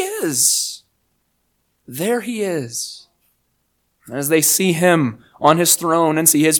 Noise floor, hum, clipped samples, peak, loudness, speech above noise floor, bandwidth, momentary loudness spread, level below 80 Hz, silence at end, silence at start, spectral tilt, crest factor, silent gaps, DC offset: -67 dBFS; 60 Hz at -50 dBFS; under 0.1%; 0 dBFS; -16 LUFS; 51 dB; 19.5 kHz; 13 LU; -64 dBFS; 0 s; 0 s; -3 dB/octave; 18 dB; none; under 0.1%